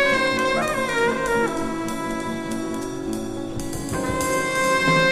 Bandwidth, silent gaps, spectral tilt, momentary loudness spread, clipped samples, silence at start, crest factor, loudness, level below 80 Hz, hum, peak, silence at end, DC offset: 15.5 kHz; none; -4 dB/octave; 10 LU; under 0.1%; 0 s; 16 dB; -23 LUFS; -42 dBFS; none; -6 dBFS; 0 s; under 0.1%